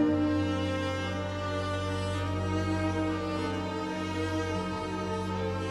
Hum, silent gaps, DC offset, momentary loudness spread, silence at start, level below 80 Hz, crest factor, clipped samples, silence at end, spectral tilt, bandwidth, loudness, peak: none; none; under 0.1%; 4 LU; 0 s; -52 dBFS; 14 dB; under 0.1%; 0 s; -6.5 dB/octave; 12 kHz; -31 LUFS; -16 dBFS